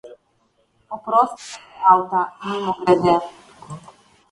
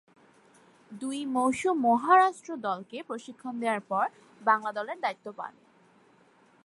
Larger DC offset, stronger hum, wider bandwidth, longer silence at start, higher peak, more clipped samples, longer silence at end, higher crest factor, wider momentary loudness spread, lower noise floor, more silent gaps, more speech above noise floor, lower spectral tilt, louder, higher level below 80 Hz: neither; neither; about the same, 11.5 kHz vs 11.5 kHz; second, 0.05 s vs 0.9 s; first, 0 dBFS vs -8 dBFS; neither; second, 0.5 s vs 1.15 s; about the same, 20 dB vs 20 dB; first, 23 LU vs 18 LU; about the same, -64 dBFS vs -62 dBFS; neither; first, 45 dB vs 33 dB; first, -6 dB/octave vs -4.5 dB/octave; first, -19 LUFS vs -28 LUFS; first, -60 dBFS vs -76 dBFS